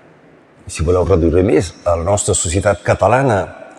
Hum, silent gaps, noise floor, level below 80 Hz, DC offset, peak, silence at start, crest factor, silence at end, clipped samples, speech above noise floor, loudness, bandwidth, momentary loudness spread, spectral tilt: none; none; -46 dBFS; -30 dBFS; under 0.1%; -2 dBFS; 0.65 s; 14 dB; 0.05 s; under 0.1%; 32 dB; -15 LUFS; 12.5 kHz; 6 LU; -5 dB/octave